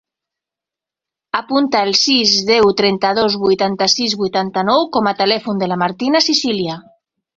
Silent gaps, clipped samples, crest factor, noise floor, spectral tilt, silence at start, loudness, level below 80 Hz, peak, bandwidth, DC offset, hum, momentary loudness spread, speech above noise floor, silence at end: none; under 0.1%; 16 dB; -87 dBFS; -3.5 dB/octave; 1.35 s; -15 LUFS; -56 dBFS; 0 dBFS; 7.8 kHz; under 0.1%; none; 7 LU; 72 dB; 0.55 s